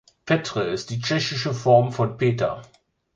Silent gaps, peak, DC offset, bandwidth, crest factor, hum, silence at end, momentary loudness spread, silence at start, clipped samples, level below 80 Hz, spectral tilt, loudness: none; -4 dBFS; under 0.1%; 7.8 kHz; 18 dB; none; 0.5 s; 9 LU; 0.25 s; under 0.1%; -56 dBFS; -5.5 dB/octave; -22 LUFS